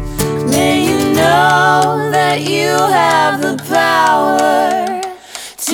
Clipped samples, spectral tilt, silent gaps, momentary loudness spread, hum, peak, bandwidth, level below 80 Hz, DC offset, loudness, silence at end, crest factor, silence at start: under 0.1%; -4 dB/octave; none; 10 LU; none; 0 dBFS; over 20 kHz; -38 dBFS; under 0.1%; -12 LUFS; 0 s; 12 dB; 0 s